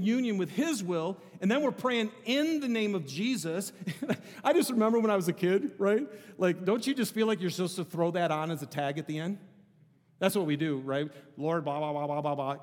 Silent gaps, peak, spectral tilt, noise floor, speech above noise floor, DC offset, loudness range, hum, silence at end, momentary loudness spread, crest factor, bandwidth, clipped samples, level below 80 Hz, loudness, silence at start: none; -12 dBFS; -5.5 dB/octave; -63 dBFS; 33 dB; under 0.1%; 4 LU; none; 0 s; 8 LU; 18 dB; 18 kHz; under 0.1%; -84 dBFS; -30 LUFS; 0 s